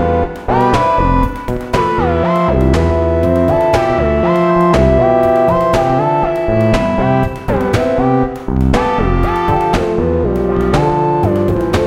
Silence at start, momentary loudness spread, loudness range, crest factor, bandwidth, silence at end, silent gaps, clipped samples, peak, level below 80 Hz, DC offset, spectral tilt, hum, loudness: 0 s; 5 LU; 2 LU; 12 dB; 16 kHz; 0 s; none; under 0.1%; 0 dBFS; -22 dBFS; under 0.1%; -7.5 dB/octave; none; -13 LUFS